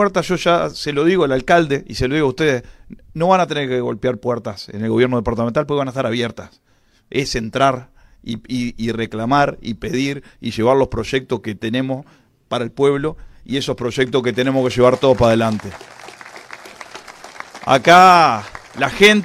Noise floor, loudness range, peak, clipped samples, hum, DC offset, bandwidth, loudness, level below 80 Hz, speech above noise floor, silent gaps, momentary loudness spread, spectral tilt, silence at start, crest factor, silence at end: -37 dBFS; 6 LU; 0 dBFS; under 0.1%; none; under 0.1%; 15.5 kHz; -17 LUFS; -42 dBFS; 21 dB; none; 21 LU; -5.5 dB/octave; 0 s; 18 dB; 0 s